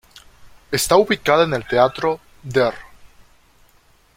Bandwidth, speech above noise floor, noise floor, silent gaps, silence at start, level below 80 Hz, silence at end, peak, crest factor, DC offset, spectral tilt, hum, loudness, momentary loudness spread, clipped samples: 16.5 kHz; 38 dB; -55 dBFS; none; 0.45 s; -50 dBFS; 1.1 s; -2 dBFS; 20 dB; under 0.1%; -4 dB/octave; none; -18 LUFS; 9 LU; under 0.1%